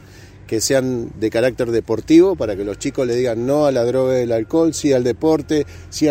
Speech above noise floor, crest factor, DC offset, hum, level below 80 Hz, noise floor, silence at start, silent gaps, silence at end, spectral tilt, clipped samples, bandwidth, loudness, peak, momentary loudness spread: 23 dB; 16 dB; under 0.1%; none; -44 dBFS; -40 dBFS; 0.1 s; none; 0 s; -5.5 dB/octave; under 0.1%; 16 kHz; -18 LUFS; -2 dBFS; 9 LU